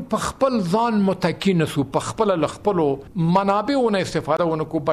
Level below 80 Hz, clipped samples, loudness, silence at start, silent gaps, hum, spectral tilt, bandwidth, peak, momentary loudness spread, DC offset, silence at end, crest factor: -48 dBFS; under 0.1%; -21 LUFS; 0 s; none; none; -6.5 dB/octave; 14.5 kHz; -6 dBFS; 4 LU; under 0.1%; 0 s; 14 dB